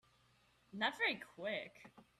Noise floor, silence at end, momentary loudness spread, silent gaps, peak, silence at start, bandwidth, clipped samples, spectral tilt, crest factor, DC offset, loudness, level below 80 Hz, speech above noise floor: -73 dBFS; 0.2 s; 16 LU; none; -22 dBFS; 0.75 s; 13.5 kHz; under 0.1%; -3.5 dB/octave; 22 dB; under 0.1%; -40 LUFS; -82 dBFS; 30 dB